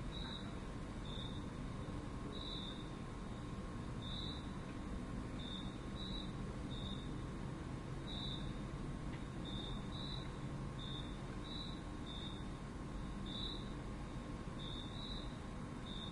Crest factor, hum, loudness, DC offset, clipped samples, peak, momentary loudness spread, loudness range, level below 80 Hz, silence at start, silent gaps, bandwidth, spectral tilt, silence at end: 14 dB; none; -47 LUFS; under 0.1%; under 0.1%; -32 dBFS; 3 LU; 1 LU; -52 dBFS; 0 s; none; 11.5 kHz; -6 dB/octave; 0 s